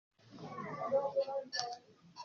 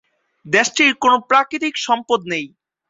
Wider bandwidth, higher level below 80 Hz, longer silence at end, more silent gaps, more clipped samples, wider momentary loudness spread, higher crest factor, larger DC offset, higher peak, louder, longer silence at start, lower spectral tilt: second, 7 kHz vs 7.8 kHz; second, -84 dBFS vs -64 dBFS; second, 0 s vs 0.4 s; neither; neither; first, 17 LU vs 11 LU; first, 24 dB vs 18 dB; neither; second, -16 dBFS vs 0 dBFS; second, -38 LUFS vs -16 LUFS; second, 0.25 s vs 0.45 s; about the same, -2.5 dB/octave vs -2.5 dB/octave